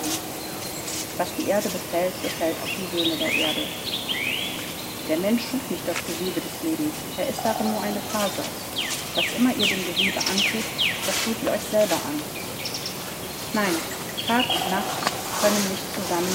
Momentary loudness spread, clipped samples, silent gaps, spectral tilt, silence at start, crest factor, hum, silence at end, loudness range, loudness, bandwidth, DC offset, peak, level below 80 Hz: 8 LU; under 0.1%; none; -3 dB/octave; 0 s; 22 dB; none; 0 s; 4 LU; -25 LUFS; 16 kHz; under 0.1%; -2 dBFS; -56 dBFS